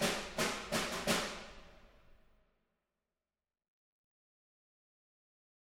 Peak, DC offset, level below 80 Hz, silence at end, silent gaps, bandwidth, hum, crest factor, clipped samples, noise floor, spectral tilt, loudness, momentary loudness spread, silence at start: -18 dBFS; under 0.1%; -62 dBFS; 3.75 s; none; 16 kHz; none; 24 dB; under 0.1%; under -90 dBFS; -2.5 dB/octave; -36 LUFS; 12 LU; 0 s